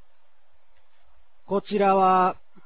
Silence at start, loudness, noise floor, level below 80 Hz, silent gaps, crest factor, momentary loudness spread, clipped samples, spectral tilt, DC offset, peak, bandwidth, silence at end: 1.5 s; -22 LUFS; -68 dBFS; -66 dBFS; none; 16 dB; 11 LU; under 0.1%; -10 dB/octave; 0.8%; -8 dBFS; 4 kHz; 0.3 s